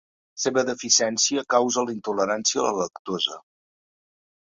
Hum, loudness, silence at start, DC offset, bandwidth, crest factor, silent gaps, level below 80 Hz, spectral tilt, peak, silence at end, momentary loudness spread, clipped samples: none; -23 LUFS; 0.35 s; under 0.1%; 7.8 kHz; 22 dB; 2.99-3.05 s; -68 dBFS; -1.5 dB/octave; -4 dBFS; 1.1 s; 9 LU; under 0.1%